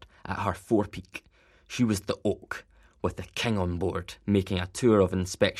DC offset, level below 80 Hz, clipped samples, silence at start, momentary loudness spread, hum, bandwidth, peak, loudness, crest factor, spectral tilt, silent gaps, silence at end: under 0.1%; -52 dBFS; under 0.1%; 0 s; 15 LU; none; 14 kHz; -8 dBFS; -28 LUFS; 20 dB; -5.5 dB/octave; none; 0 s